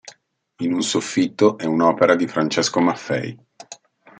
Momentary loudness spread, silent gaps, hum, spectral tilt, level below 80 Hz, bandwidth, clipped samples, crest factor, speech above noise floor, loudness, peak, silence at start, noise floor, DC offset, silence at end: 15 LU; none; none; -4.5 dB/octave; -68 dBFS; 9.4 kHz; under 0.1%; 18 dB; 37 dB; -19 LUFS; -2 dBFS; 0.05 s; -56 dBFS; under 0.1%; 0.45 s